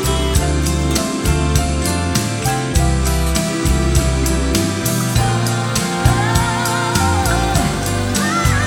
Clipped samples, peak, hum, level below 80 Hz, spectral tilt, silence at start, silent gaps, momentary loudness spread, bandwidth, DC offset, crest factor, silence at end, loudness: under 0.1%; -2 dBFS; none; -22 dBFS; -4.5 dB/octave; 0 s; none; 2 LU; 19.5 kHz; under 0.1%; 14 dB; 0 s; -16 LUFS